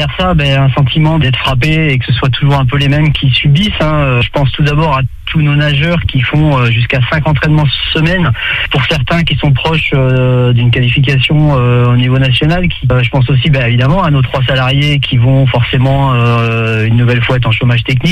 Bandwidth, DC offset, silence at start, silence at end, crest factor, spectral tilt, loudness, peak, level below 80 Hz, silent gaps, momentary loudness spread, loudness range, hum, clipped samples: 8.8 kHz; under 0.1%; 0 s; 0 s; 8 dB; -7 dB/octave; -10 LUFS; 0 dBFS; -26 dBFS; none; 2 LU; 1 LU; none; under 0.1%